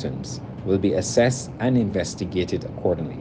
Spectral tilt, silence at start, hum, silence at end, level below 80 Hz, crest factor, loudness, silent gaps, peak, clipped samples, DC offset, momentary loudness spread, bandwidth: -5.5 dB/octave; 0 s; none; 0 s; -46 dBFS; 18 dB; -24 LUFS; none; -4 dBFS; under 0.1%; under 0.1%; 10 LU; 10 kHz